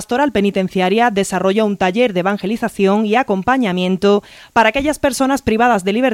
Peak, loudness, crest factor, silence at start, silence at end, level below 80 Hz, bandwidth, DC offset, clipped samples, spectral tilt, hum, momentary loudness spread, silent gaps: 0 dBFS; -15 LUFS; 14 dB; 0 s; 0 s; -44 dBFS; 16 kHz; under 0.1%; under 0.1%; -5 dB/octave; none; 4 LU; none